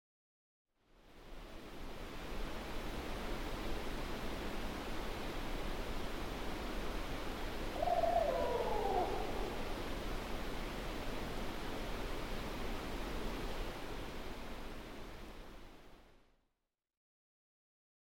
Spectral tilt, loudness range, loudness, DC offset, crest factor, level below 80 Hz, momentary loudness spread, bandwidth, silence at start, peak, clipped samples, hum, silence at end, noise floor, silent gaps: -5 dB/octave; 11 LU; -42 LUFS; under 0.1%; 18 dB; -46 dBFS; 15 LU; 17 kHz; 0.95 s; -22 dBFS; under 0.1%; none; 1.9 s; -88 dBFS; none